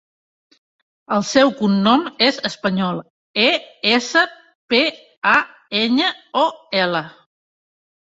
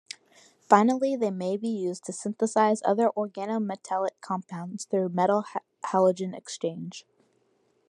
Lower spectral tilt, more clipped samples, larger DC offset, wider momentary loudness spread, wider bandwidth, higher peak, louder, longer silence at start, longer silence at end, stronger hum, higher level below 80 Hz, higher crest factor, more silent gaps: second, -4 dB/octave vs -5.5 dB/octave; neither; neither; second, 8 LU vs 14 LU; second, 8 kHz vs 11.5 kHz; about the same, 0 dBFS vs -2 dBFS; first, -18 LUFS vs -27 LUFS; first, 1.1 s vs 0.7 s; about the same, 0.9 s vs 0.9 s; neither; first, -62 dBFS vs -82 dBFS; second, 18 dB vs 24 dB; first, 3.10-3.34 s, 4.55-4.68 s, 5.17-5.22 s vs none